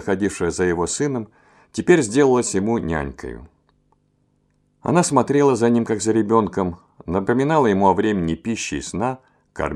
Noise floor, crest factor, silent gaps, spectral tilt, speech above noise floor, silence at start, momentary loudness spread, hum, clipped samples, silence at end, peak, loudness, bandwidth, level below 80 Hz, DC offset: -64 dBFS; 20 dB; none; -5.5 dB/octave; 45 dB; 0 s; 14 LU; 50 Hz at -55 dBFS; under 0.1%; 0 s; -2 dBFS; -20 LUFS; 12 kHz; -46 dBFS; under 0.1%